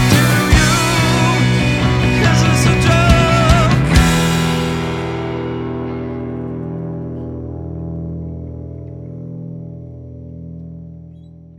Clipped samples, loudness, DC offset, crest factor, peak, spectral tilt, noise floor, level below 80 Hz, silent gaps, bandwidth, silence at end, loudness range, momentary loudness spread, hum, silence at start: under 0.1%; -15 LUFS; under 0.1%; 16 dB; 0 dBFS; -5 dB/octave; -38 dBFS; -26 dBFS; none; 18 kHz; 0.35 s; 16 LU; 20 LU; none; 0 s